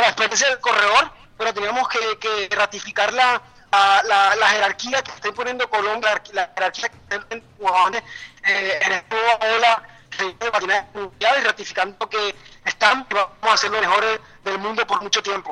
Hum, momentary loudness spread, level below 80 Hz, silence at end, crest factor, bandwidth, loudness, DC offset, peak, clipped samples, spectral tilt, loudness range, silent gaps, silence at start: none; 11 LU; -58 dBFS; 0 s; 18 dB; 10.5 kHz; -19 LUFS; under 0.1%; -2 dBFS; under 0.1%; -0.5 dB/octave; 4 LU; none; 0 s